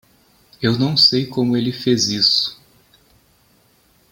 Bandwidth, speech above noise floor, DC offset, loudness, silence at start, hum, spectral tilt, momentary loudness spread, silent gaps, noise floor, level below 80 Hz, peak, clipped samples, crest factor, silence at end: 17 kHz; 40 dB; under 0.1%; -16 LUFS; 0.6 s; none; -4 dB/octave; 8 LU; none; -57 dBFS; -58 dBFS; -2 dBFS; under 0.1%; 18 dB; 1.6 s